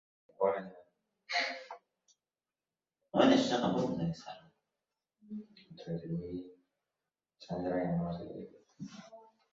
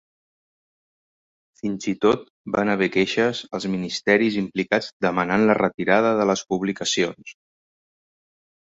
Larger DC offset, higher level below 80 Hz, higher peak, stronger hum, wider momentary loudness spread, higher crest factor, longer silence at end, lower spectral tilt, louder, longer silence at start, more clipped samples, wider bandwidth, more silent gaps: neither; second, -68 dBFS vs -60 dBFS; second, -12 dBFS vs -4 dBFS; neither; first, 23 LU vs 8 LU; about the same, 24 dB vs 20 dB; second, 0.35 s vs 1.4 s; about the same, -4.5 dB/octave vs -4.5 dB/octave; second, -34 LUFS vs -22 LUFS; second, 0.4 s vs 1.65 s; neither; about the same, 7.6 kHz vs 8 kHz; second, none vs 2.30-2.45 s, 4.92-5.00 s